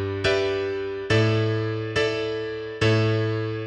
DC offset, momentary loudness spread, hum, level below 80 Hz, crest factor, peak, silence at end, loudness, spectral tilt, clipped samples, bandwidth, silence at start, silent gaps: under 0.1%; 8 LU; none; -50 dBFS; 16 dB; -8 dBFS; 0 s; -24 LUFS; -6.5 dB/octave; under 0.1%; 9.4 kHz; 0 s; none